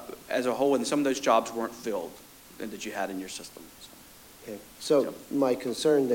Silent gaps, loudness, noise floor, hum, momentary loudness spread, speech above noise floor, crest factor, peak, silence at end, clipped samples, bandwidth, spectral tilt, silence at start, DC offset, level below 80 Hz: none; -28 LUFS; -51 dBFS; none; 22 LU; 23 dB; 20 dB; -8 dBFS; 0 s; under 0.1%; 17 kHz; -4 dB/octave; 0 s; under 0.1%; -64 dBFS